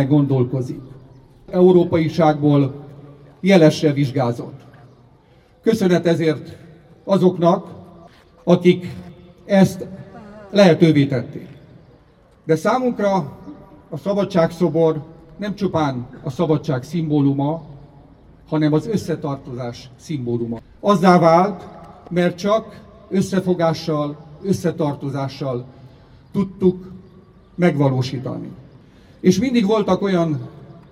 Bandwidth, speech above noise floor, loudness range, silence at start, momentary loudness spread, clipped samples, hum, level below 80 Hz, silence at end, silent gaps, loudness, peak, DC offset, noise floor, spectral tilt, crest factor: 13 kHz; 34 dB; 5 LU; 0 s; 19 LU; under 0.1%; none; -52 dBFS; 0.2 s; none; -18 LUFS; 0 dBFS; under 0.1%; -52 dBFS; -7.5 dB/octave; 18 dB